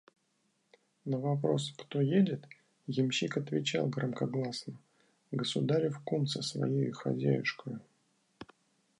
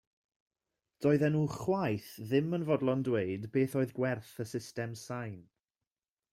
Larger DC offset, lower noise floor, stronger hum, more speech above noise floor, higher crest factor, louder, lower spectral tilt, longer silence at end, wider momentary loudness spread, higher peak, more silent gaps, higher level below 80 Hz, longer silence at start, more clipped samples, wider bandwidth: neither; second, -76 dBFS vs under -90 dBFS; neither; second, 44 dB vs over 58 dB; about the same, 18 dB vs 18 dB; about the same, -33 LUFS vs -33 LUFS; about the same, -6 dB/octave vs -7 dB/octave; second, 0.55 s vs 0.9 s; first, 17 LU vs 11 LU; about the same, -16 dBFS vs -16 dBFS; neither; second, -78 dBFS vs -70 dBFS; about the same, 1.05 s vs 1 s; neither; second, 11 kHz vs 16 kHz